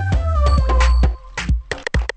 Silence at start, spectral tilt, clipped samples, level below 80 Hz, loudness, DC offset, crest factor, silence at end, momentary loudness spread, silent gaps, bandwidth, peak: 0 s; -6 dB/octave; under 0.1%; -18 dBFS; -19 LUFS; under 0.1%; 14 dB; 0.1 s; 7 LU; none; 8.6 kHz; -2 dBFS